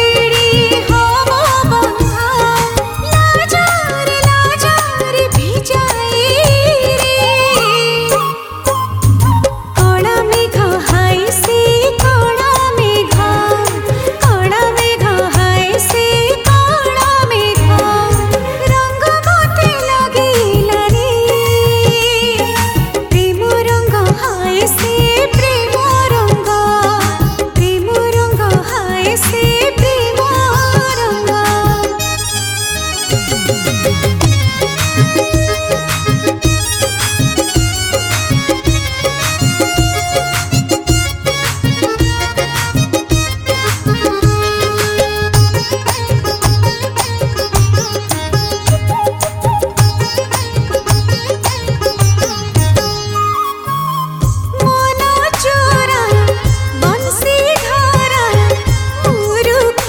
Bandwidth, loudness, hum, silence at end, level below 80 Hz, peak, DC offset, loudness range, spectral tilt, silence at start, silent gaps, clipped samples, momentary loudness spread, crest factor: 17.5 kHz; -12 LUFS; none; 0 s; -26 dBFS; 0 dBFS; under 0.1%; 3 LU; -4 dB/octave; 0 s; none; under 0.1%; 5 LU; 12 dB